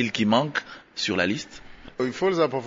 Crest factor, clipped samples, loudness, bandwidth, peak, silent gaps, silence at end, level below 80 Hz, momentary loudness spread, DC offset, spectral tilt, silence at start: 18 dB; under 0.1%; -25 LUFS; 7.8 kHz; -8 dBFS; none; 0 s; -56 dBFS; 18 LU; under 0.1%; -5 dB/octave; 0 s